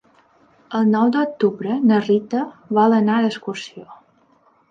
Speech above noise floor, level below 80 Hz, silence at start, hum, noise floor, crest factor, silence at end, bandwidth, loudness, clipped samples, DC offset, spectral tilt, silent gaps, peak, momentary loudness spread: 39 dB; -70 dBFS; 0.7 s; none; -57 dBFS; 16 dB; 0.75 s; 7.4 kHz; -19 LUFS; under 0.1%; under 0.1%; -7 dB/octave; none; -4 dBFS; 13 LU